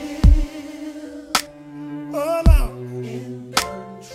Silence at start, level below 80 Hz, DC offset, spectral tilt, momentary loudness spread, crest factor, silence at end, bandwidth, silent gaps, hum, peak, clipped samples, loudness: 0 s; -22 dBFS; under 0.1%; -5 dB/octave; 17 LU; 20 dB; 0 s; 15.5 kHz; none; none; 0 dBFS; under 0.1%; -21 LUFS